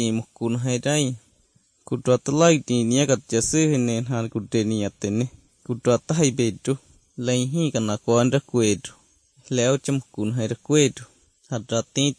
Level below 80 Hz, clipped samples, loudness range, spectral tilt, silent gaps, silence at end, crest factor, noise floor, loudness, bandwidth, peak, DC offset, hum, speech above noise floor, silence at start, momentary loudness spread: -58 dBFS; under 0.1%; 3 LU; -5 dB/octave; none; 0.05 s; 20 dB; -62 dBFS; -23 LUFS; 10.5 kHz; -4 dBFS; under 0.1%; none; 40 dB; 0 s; 11 LU